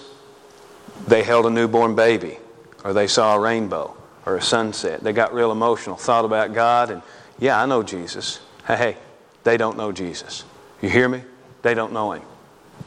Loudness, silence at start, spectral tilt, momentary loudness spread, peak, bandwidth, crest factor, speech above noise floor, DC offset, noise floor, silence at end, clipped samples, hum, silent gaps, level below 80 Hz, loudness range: -20 LUFS; 0 s; -4 dB/octave; 15 LU; 0 dBFS; 11 kHz; 20 dB; 27 dB; under 0.1%; -46 dBFS; 0 s; under 0.1%; none; none; -60 dBFS; 4 LU